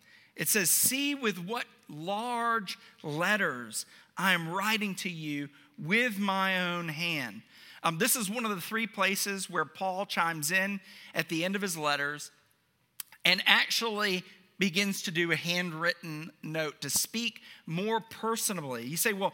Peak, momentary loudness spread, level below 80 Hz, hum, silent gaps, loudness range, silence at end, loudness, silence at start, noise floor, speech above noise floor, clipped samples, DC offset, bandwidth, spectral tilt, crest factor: -4 dBFS; 12 LU; -82 dBFS; none; none; 4 LU; 0 s; -29 LUFS; 0.35 s; -72 dBFS; 40 dB; under 0.1%; under 0.1%; 17 kHz; -2.5 dB/octave; 28 dB